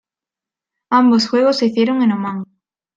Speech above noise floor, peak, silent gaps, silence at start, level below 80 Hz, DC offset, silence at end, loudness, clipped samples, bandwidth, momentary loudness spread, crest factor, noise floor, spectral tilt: 74 dB; -2 dBFS; none; 0.9 s; -64 dBFS; under 0.1%; 0.5 s; -15 LUFS; under 0.1%; 7.8 kHz; 13 LU; 16 dB; -88 dBFS; -5.5 dB/octave